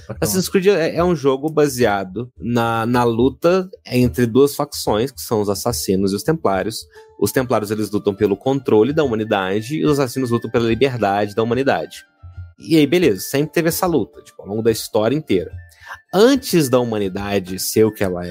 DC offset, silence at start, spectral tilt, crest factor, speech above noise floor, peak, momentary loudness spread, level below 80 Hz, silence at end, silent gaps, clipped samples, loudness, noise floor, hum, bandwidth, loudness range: under 0.1%; 0.1 s; -5.5 dB/octave; 16 dB; 19 dB; -2 dBFS; 8 LU; -44 dBFS; 0 s; none; under 0.1%; -18 LUFS; -37 dBFS; none; 16 kHz; 2 LU